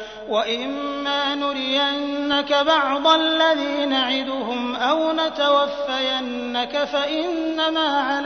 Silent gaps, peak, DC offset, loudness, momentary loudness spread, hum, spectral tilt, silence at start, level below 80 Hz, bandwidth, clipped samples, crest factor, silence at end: none; -2 dBFS; under 0.1%; -21 LUFS; 7 LU; none; -2.5 dB/octave; 0 s; -56 dBFS; 6.6 kHz; under 0.1%; 18 dB; 0 s